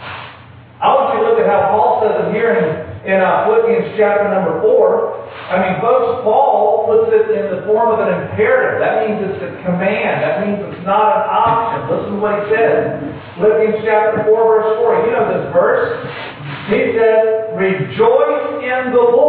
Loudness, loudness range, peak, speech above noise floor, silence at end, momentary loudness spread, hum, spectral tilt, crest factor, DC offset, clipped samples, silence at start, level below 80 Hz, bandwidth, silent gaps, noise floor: -14 LUFS; 2 LU; -2 dBFS; 24 dB; 0 s; 8 LU; none; -10.5 dB/octave; 12 dB; under 0.1%; under 0.1%; 0 s; -54 dBFS; 4.5 kHz; none; -38 dBFS